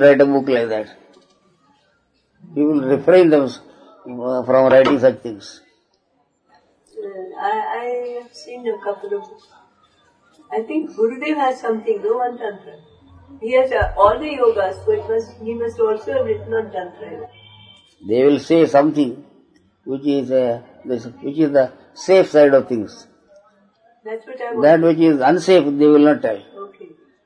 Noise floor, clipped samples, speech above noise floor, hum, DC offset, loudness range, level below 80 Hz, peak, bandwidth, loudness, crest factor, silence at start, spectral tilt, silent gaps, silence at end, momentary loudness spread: -64 dBFS; under 0.1%; 48 dB; none; under 0.1%; 11 LU; -46 dBFS; 0 dBFS; 10 kHz; -17 LUFS; 18 dB; 0 s; -6.5 dB/octave; none; 0.4 s; 20 LU